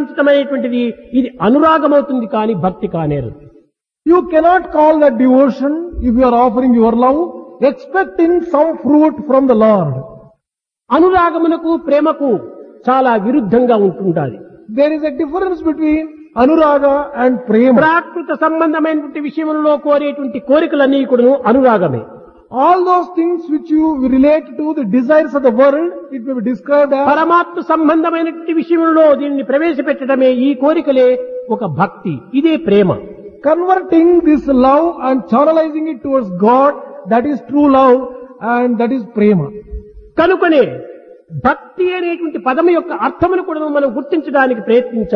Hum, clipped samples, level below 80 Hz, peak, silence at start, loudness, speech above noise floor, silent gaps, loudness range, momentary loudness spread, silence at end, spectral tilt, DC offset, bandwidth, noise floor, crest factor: none; under 0.1%; -42 dBFS; 0 dBFS; 0 s; -13 LUFS; 67 dB; none; 3 LU; 9 LU; 0 s; -9 dB/octave; under 0.1%; 6 kHz; -79 dBFS; 12 dB